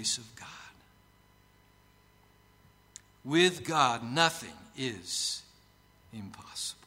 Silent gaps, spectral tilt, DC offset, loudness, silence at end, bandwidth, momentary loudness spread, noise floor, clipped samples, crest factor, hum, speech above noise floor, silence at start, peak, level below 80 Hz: none; -3 dB/octave; under 0.1%; -30 LUFS; 0.15 s; 16 kHz; 24 LU; -63 dBFS; under 0.1%; 26 dB; 50 Hz at -65 dBFS; 32 dB; 0 s; -8 dBFS; -68 dBFS